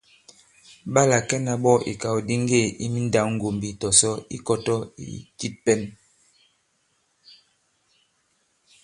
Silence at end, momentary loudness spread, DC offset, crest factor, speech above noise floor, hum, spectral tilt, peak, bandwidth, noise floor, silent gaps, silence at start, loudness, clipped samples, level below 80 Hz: 2.9 s; 15 LU; under 0.1%; 26 dB; 46 dB; none; -4 dB/octave; 0 dBFS; 11.5 kHz; -69 dBFS; none; 0.85 s; -22 LUFS; under 0.1%; -56 dBFS